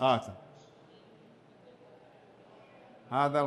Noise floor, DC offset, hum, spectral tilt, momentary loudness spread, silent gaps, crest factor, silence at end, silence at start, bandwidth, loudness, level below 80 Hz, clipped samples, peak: -58 dBFS; under 0.1%; none; -6 dB/octave; 28 LU; none; 22 dB; 0 s; 0 s; 11.5 kHz; -32 LUFS; -76 dBFS; under 0.1%; -14 dBFS